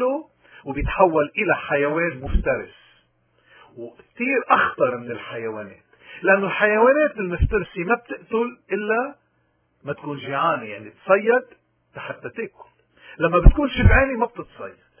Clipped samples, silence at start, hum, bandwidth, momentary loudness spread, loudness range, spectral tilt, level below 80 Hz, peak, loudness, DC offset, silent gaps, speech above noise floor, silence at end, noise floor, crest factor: under 0.1%; 0 s; none; 3.5 kHz; 20 LU; 5 LU; -10.5 dB/octave; -28 dBFS; 0 dBFS; -21 LUFS; under 0.1%; none; 46 dB; 0.3 s; -66 dBFS; 22 dB